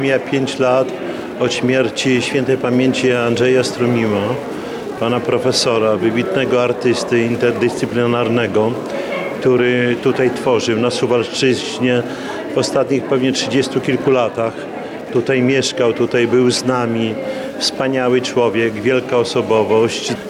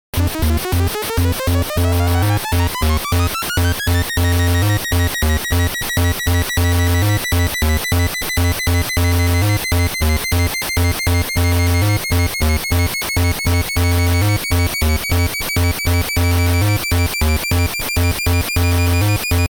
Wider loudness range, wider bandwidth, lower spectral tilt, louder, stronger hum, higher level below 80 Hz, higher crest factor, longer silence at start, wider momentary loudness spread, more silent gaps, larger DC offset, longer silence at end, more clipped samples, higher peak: about the same, 1 LU vs 1 LU; second, 13.5 kHz vs over 20 kHz; about the same, -5 dB/octave vs -4.5 dB/octave; about the same, -16 LUFS vs -17 LUFS; neither; second, -54 dBFS vs -24 dBFS; about the same, 12 dB vs 12 dB; second, 0 s vs 0.15 s; first, 7 LU vs 2 LU; neither; neither; about the same, 0 s vs 0.1 s; neither; about the same, -4 dBFS vs -4 dBFS